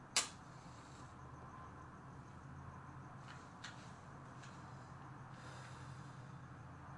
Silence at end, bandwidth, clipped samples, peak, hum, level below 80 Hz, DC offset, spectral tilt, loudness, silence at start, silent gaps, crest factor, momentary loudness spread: 0 s; 11.5 kHz; under 0.1%; -18 dBFS; none; -72 dBFS; under 0.1%; -2.5 dB/octave; -51 LUFS; 0 s; none; 32 dB; 3 LU